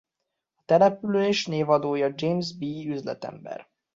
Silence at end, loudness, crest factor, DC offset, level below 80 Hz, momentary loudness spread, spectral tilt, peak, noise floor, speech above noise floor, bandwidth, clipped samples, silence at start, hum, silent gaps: 0.35 s; -25 LUFS; 18 dB; under 0.1%; -68 dBFS; 16 LU; -6 dB/octave; -8 dBFS; -83 dBFS; 58 dB; 7.8 kHz; under 0.1%; 0.7 s; none; none